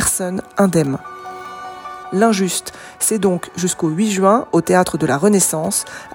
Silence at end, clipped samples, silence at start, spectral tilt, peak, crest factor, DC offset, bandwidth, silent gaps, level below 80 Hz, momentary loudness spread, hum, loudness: 0 s; under 0.1%; 0 s; -4.5 dB/octave; 0 dBFS; 16 dB; under 0.1%; 17 kHz; none; -48 dBFS; 17 LU; none; -17 LUFS